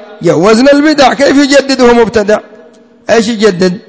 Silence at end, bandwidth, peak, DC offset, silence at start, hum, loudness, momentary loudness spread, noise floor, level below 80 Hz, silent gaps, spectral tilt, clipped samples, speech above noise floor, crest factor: 0.1 s; 8 kHz; 0 dBFS; under 0.1%; 0 s; none; -7 LUFS; 6 LU; -38 dBFS; -38 dBFS; none; -4.5 dB/octave; 4%; 31 dB; 8 dB